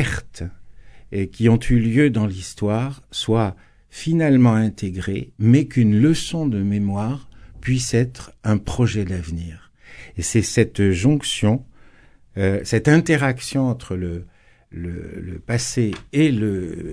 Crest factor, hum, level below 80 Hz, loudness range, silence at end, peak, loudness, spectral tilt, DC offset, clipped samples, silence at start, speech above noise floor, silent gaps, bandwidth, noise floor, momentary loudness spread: 18 dB; none; -40 dBFS; 5 LU; 0 s; -2 dBFS; -20 LUFS; -6 dB/octave; under 0.1%; under 0.1%; 0 s; 30 dB; none; 11 kHz; -49 dBFS; 15 LU